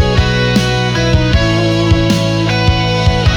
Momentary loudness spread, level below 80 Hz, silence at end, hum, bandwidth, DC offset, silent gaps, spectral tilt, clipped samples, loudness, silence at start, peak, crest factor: 1 LU; -20 dBFS; 0 s; none; 13 kHz; under 0.1%; none; -5.5 dB/octave; under 0.1%; -12 LUFS; 0 s; 0 dBFS; 10 dB